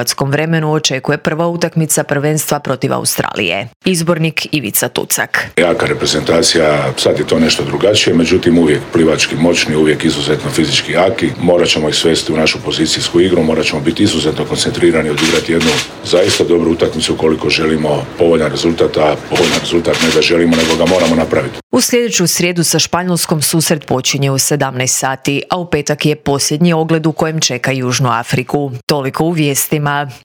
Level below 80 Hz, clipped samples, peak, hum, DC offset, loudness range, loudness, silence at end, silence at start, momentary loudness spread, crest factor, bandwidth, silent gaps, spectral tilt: -44 dBFS; under 0.1%; 0 dBFS; none; under 0.1%; 3 LU; -12 LUFS; 0.05 s; 0 s; 5 LU; 12 dB; over 20 kHz; 3.76-3.80 s, 21.63-21.70 s, 28.83-28.87 s; -4 dB/octave